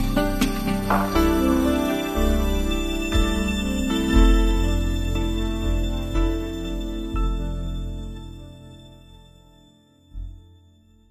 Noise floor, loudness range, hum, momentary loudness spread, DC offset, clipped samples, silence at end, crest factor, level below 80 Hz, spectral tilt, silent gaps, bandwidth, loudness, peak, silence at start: -54 dBFS; 13 LU; none; 19 LU; under 0.1%; under 0.1%; 0.7 s; 18 dB; -26 dBFS; -5.5 dB/octave; none; 14 kHz; -23 LUFS; -4 dBFS; 0 s